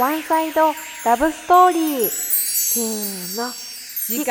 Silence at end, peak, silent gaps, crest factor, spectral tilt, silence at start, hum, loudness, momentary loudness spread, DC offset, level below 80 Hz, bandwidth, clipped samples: 0 s; -2 dBFS; none; 16 dB; -2 dB/octave; 0 s; none; -18 LUFS; 11 LU; under 0.1%; -54 dBFS; 19.5 kHz; under 0.1%